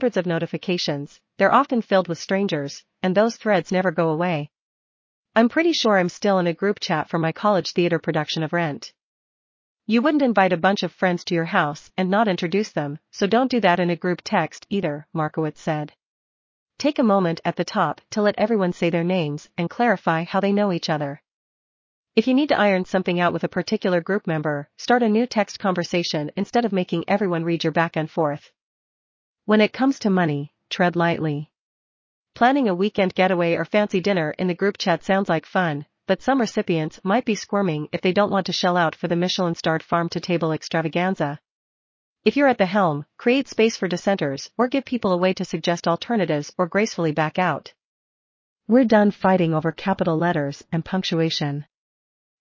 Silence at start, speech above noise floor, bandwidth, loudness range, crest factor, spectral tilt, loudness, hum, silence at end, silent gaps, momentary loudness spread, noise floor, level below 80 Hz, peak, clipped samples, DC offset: 0 s; over 69 dB; 7.6 kHz; 3 LU; 20 dB; -6 dB/octave; -22 LUFS; none; 0.75 s; 4.59-5.23 s, 9.03-9.77 s, 16.03-16.66 s, 21.31-22.04 s, 28.61-29.35 s, 31.59-32.25 s, 41.50-42.16 s, 47.85-48.56 s; 8 LU; under -90 dBFS; -64 dBFS; -2 dBFS; under 0.1%; under 0.1%